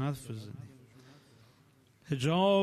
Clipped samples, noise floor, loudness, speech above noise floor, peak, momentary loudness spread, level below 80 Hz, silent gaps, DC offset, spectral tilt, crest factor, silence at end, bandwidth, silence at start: under 0.1%; -64 dBFS; -32 LUFS; 34 dB; -16 dBFS; 22 LU; -68 dBFS; none; under 0.1%; -6.5 dB/octave; 16 dB; 0 s; 13.5 kHz; 0 s